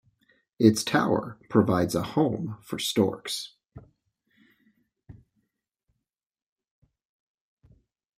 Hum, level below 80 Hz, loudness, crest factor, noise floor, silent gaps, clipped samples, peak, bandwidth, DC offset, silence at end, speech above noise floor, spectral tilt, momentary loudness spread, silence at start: none; -62 dBFS; -26 LUFS; 24 dB; -84 dBFS; none; under 0.1%; -4 dBFS; 16 kHz; under 0.1%; 3.05 s; 59 dB; -5.5 dB/octave; 12 LU; 0.6 s